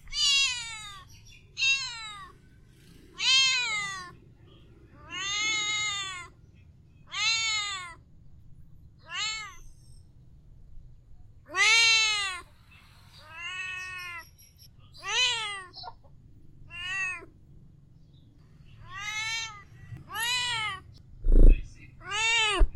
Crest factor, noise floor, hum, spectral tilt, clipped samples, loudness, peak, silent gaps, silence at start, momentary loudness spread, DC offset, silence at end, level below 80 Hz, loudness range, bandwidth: 22 dB; -55 dBFS; none; -1 dB/octave; under 0.1%; -26 LUFS; -6 dBFS; none; 0.05 s; 23 LU; under 0.1%; 0.05 s; -32 dBFS; 12 LU; 12 kHz